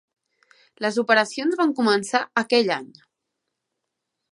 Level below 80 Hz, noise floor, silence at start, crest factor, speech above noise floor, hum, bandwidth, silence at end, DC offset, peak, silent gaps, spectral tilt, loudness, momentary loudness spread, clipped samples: -76 dBFS; -81 dBFS; 0.8 s; 22 dB; 60 dB; none; 11.5 kHz; 1.45 s; under 0.1%; -2 dBFS; none; -3.5 dB/octave; -21 LUFS; 6 LU; under 0.1%